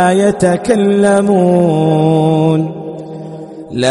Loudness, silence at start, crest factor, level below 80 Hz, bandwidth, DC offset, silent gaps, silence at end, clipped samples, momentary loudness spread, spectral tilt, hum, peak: -11 LUFS; 0 s; 12 dB; -48 dBFS; 11.5 kHz; under 0.1%; none; 0 s; under 0.1%; 17 LU; -7 dB/octave; none; 0 dBFS